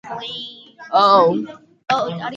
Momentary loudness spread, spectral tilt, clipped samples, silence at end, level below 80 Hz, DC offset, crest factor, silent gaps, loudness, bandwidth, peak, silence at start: 21 LU; -5.5 dB/octave; under 0.1%; 0 s; -66 dBFS; under 0.1%; 18 dB; none; -17 LUFS; 7.8 kHz; -2 dBFS; 0.05 s